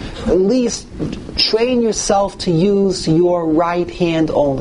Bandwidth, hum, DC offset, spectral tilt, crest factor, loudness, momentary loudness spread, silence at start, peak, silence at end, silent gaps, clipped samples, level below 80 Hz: 11 kHz; none; under 0.1%; -5 dB/octave; 14 dB; -16 LUFS; 6 LU; 0 s; 0 dBFS; 0 s; none; under 0.1%; -36 dBFS